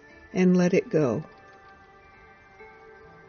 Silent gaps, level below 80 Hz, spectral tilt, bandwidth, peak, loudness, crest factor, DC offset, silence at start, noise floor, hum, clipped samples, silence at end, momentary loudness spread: none; -64 dBFS; -8 dB/octave; 6.8 kHz; -10 dBFS; -24 LUFS; 18 dB; under 0.1%; 0.35 s; -52 dBFS; none; under 0.1%; 0.65 s; 13 LU